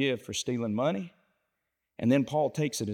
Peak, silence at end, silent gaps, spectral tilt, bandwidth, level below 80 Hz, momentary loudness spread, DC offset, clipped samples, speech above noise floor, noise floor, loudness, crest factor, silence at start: -14 dBFS; 0 s; none; -5 dB/octave; 17 kHz; -70 dBFS; 7 LU; under 0.1%; under 0.1%; 54 dB; -83 dBFS; -29 LUFS; 16 dB; 0 s